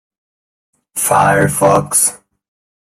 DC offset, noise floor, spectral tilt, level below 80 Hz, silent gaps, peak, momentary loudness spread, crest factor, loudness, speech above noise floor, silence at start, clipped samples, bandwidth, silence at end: under 0.1%; under -90 dBFS; -4 dB/octave; -48 dBFS; none; 0 dBFS; 6 LU; 16 dB; -12 LUFS; over 78 dB; 0.95 s; under 0.1%; 16 kHz; 0.8 s